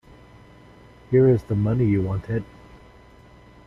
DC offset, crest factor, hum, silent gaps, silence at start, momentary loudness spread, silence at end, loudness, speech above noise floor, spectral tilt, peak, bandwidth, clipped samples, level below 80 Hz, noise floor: under 0.1%; 16 dB; none; none; 1.1 s; 12 LU; 1.2 s; -22 LUFS; 29 dB; -10.5 dB/octave; -8 dBFS; 6 kHz; under 0.1%; -48 dBFS; -49 dBFS